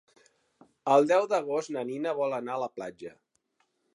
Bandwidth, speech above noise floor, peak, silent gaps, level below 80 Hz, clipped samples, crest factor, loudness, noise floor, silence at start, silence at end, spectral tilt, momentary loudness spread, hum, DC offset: 11 kHz; 47 dB; -10 dBFS; none; -82 dBFS; under 0.1%; 20 dB; -28 LUFS; -75 dBFS; 0.85 s; 0.85 s; -5 dB/octave; 18 LU; none; under 0.1%